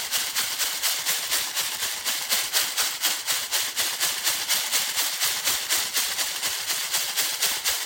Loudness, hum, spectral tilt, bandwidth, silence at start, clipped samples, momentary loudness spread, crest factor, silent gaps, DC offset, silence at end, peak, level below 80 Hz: -23 LUFS; none; 2.5 dB/octave; 17 kHz; 0 s; under 0.1%; 3 LU; 20 dB; none; under 0.1%; 0 s; -6 dBFS; -66 dBFS